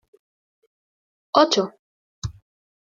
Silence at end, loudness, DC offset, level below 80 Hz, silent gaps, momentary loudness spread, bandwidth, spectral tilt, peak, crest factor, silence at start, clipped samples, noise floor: 0.6 s; -20 LUFS; under 0.1%; -52 dBFS; 1.79-2.22 s; 18 LU; 7.6 kHz; -4 dB/octave; -2 dBFS; 24 dB; 1.35 s; under 0.1%; under -90 dBFS